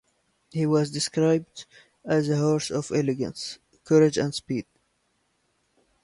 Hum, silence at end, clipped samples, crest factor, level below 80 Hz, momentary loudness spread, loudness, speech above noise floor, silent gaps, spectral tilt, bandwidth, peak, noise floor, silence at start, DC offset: none; 1.4 s; under 0.1%; 18 dB; -62 dBFS; 16 LU; -25 LUFS; 47 dB; none; -5.5 dB/octave; 11.5 kHz; -8 dBFS; -71 dBFS; 0.55 s; under 0.1%